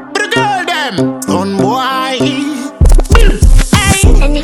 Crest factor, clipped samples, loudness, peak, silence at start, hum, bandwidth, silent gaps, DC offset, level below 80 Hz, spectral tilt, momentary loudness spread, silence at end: 8 dB; 2%; -11 LUFS; 0 dBFS; 0 s; none; 13.5 kHz; none; under 0.1%; -10 dBFS; -4.5 dB/octave; 5 LU; 0 s